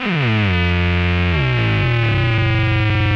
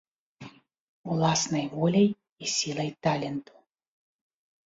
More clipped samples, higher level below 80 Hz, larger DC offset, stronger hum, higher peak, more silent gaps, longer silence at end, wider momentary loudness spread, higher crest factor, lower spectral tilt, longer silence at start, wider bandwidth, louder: neither; first, -30 dBFS vs -66 dBFS; neither; neither; first, -6 dBFS vs -12 dBFS; second, none vs 0.80-1.04 s, 2.32-2.36 s; second, 0 s vs 1.25 s; second, 1 LU vs 21 LU; second, 10 dB vs 18 dB; first, -7.5 dB/octave vs -4.5 dB/octave; second, 0 s vs 0.4 s; second, 6.6 kHz vs 7.8 kHz; first, -16 LUFS vs -27 LUFS